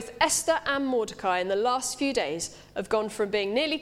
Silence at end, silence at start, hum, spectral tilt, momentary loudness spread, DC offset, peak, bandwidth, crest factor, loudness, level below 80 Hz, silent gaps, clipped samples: 0 s; 0 s; 50 Hz at -60 dBFS; -2 dB/octave; 6 LU; under 0.1%; -8 dBFS; 16 kHz; 20 dB; -27 LUFS; -58 dBFS; none; under 0.1%